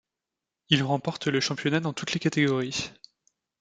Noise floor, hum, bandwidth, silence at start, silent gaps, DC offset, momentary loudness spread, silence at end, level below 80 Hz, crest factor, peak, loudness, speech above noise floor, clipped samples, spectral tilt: -88 dBFS; none; 9.4 kHz; 0.7 s; none; under 0.1%; 7 LU; 0.7 s; -64 dBFS; 24 dB; -4 dBFS; -26 LUFS; 61 dB; under 0.1%; -4.5 dB/octave